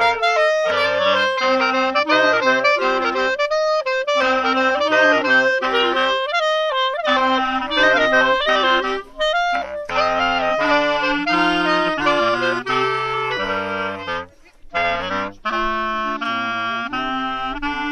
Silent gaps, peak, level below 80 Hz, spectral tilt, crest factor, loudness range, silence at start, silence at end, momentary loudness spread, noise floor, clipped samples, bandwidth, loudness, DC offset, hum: none; -2 dBFS; -46 dBFS; -3.5 dB/octave; 16 dB; 6 LU; 0 s; 0 s; 8 LU; -42 dBFS; under 0.1%; 10.5 kHz; -18 LUFS; under 0.1%; none